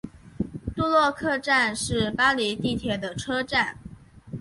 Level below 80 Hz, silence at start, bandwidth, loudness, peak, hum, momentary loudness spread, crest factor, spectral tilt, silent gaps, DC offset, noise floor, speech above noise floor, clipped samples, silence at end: -48 dBFS; 0.05 s; 11.5 kHz; -24 LUFS; -8 dBFS; none; 13 LU; 18 dB; -4 dB/octave; none; under 0.1%; -45 dBFS; 21 dB; under 0.1%; 0 s